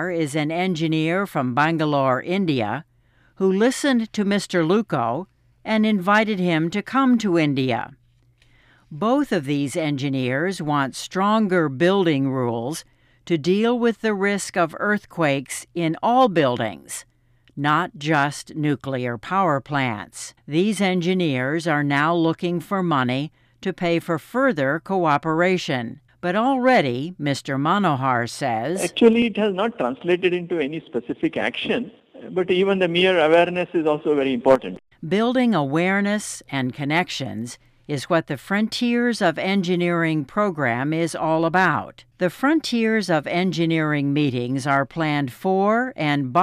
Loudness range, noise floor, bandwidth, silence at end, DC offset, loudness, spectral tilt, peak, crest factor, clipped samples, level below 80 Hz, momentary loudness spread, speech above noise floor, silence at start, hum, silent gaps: 3 LU; -58 dBFS; 15.5 kHz; 0 s; under 0.1%; -21 LUFS; -5.5 dB/octave; -4 dBFS; 16 dB; under 0.1%; -60 dBFS; 8 LU; 38 dB; 0 s; none; none